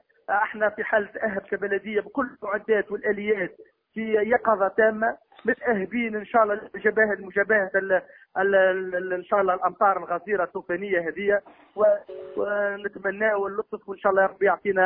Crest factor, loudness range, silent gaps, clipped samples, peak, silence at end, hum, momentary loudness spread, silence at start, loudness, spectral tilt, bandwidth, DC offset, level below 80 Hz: 18 dB; 3 LU; none; under 0.1%; -8 dBFS; 0 s; none; 8 LU; 0.3 s; -24 LUFS; -9.5 dB/octave; 3.8 kHz; under 0.1%; -64 dBFS